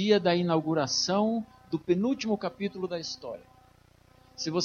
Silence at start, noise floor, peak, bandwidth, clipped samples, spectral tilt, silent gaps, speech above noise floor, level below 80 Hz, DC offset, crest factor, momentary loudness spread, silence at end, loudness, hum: 0 s; -60 dBFS; -10 dBFS; 7.2 kHz; under 0.1%; -4.5 dB/octave; none; 32 dB; -66 dBFS; under 0.1%; 18 dB; 11 LU; 0 s; -29 LUFS; 60 Hz at -55 dBFS